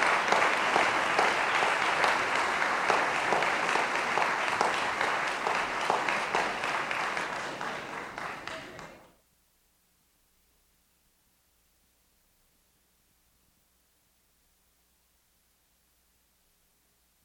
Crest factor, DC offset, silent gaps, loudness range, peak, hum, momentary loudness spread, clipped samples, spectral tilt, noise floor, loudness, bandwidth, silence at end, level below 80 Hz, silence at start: 22 dB; under 0.1%; none; 16 LU; -8 dBFS; none; 13 LU; under 0.1%; -2 dB/octave; -69 dBFS; -28 LUFS; 18 kHz; 8.25 s; -66 dBFS; 0 s